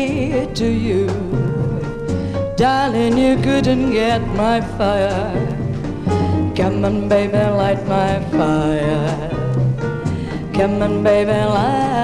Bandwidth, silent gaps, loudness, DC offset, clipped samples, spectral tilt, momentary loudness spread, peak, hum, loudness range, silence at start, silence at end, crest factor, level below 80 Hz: 11.5 kHz; none; -18 LUFS; under 0.1%; under 0.1%; -7 dB/octave; 7 LU; -4 dBFS; none; 2 LU; 0 s; 0 s; 12 dB; -34 dBFS